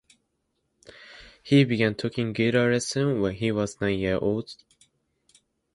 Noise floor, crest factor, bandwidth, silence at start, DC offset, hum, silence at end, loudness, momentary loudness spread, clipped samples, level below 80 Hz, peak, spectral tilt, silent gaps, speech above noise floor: -76 dBFS; 20 dB; 11.5 kHz; 1 s; under 0.1%; none; 1.2 s; -25 LUFS; 22 LU; under 0.1%; -54 dBFS; -8 dBFS; -6 dB/octave; none; 52 dB